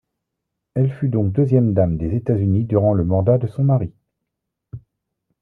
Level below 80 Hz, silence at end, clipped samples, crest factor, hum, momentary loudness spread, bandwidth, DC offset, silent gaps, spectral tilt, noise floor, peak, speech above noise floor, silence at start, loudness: -46 dBFS; 0.65 s; under 0.1%; 16 dB; none; 5 LU; 2.9 kHz; under 0.1%; none; -12.5 dB/octave; -80 dBFS; -2 dBFS; 63 dB; 0.75 s; -19 LUFS